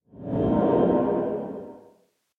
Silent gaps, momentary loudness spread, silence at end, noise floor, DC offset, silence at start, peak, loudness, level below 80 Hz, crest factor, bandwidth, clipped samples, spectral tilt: none; 16 LU; 0.6 s; -62 dBFS; under 0.1%; 0.15 s; -8 dBFS; -24 LUFS; -48 dBFS; 16 dB; 4.1 kHz; under 0.1%; -11 dB/octave